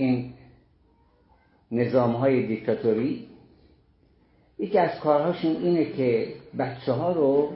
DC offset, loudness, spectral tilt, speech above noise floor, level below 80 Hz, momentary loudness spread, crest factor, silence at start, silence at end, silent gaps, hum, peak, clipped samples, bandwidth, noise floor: under 0.1%; -25 LUFS; -11.5 dB/octave; 38 dB; -62 dBFS; 9 LU; 18 dB; 0 s; 0 s; none; none; -8 dBFS; under 0.1%; 5.8 kHz; -61 dBFS